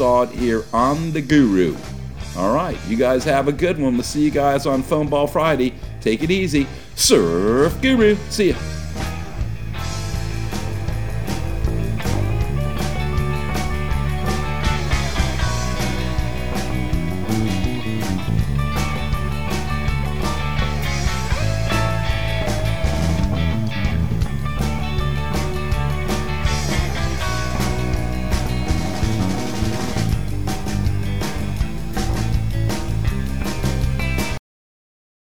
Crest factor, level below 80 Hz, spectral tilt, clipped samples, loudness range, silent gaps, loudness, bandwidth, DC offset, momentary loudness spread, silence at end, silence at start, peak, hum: 20 dB; -26 dBFS; -5.5 dB/octave; under 0.1%; 5 LU; none; -21 LUFS; 19.5 kHz; 4%; 8 LU; 0.9 s; 0 s; 0 dBFS; none